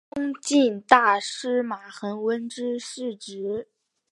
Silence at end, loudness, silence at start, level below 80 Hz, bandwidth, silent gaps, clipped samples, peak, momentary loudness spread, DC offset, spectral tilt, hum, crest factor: 0.5 s; -24 LUFS; 0.15 s; -68 dBFS; 11.5 kHz; none; under 0.1%; 0 dBFS; 15 LU; under 0.1%; -3 dB/octave; none; 24 dB